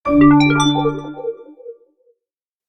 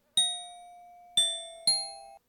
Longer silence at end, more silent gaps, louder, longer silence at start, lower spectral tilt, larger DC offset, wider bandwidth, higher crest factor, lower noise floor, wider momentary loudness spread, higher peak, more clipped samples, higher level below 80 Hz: first, 0.95 s vs 0.1 s; neither; first, -14 LUFS vs -28 LUFS; about the same, 0.05 s vs 0.15 s; first, -6 dB/octave vs 2 dB/octave; neither; second, 11 kHz vs 19 kHz; about the same, 16 dB vs 18 dB; first, -87 dBFS vs -52 dBFS; first, 18 LU vs 13 LU; first, 0 dBFS vs -14 dBFS; neither; first, -42 dBFS vs -76 dBFS